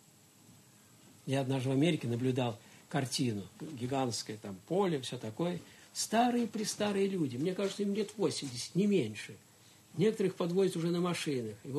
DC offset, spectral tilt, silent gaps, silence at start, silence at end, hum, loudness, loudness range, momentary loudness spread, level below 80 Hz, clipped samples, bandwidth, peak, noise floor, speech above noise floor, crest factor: under 0.1%; -5.5 dB/octave; none; 0.5 s; 0 s; none; -34 LUFS; 2 LU; 12 LU; -76 dBFS; under 0.1%; 13 kHz; -16 dBFS; -61 dBFS; 28 dB; 18 dB